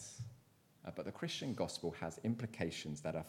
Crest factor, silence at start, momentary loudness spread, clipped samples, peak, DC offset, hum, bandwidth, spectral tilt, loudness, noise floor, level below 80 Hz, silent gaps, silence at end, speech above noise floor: 20 dB; 0 s; 10 LU; under 0.1%; -24 dBFS; under 0.1%; none; 16.5 kHz; -5 dB/octave; -43 LUFS; -68 dBFS; -70 dBFS; none; 0 s; 26 dB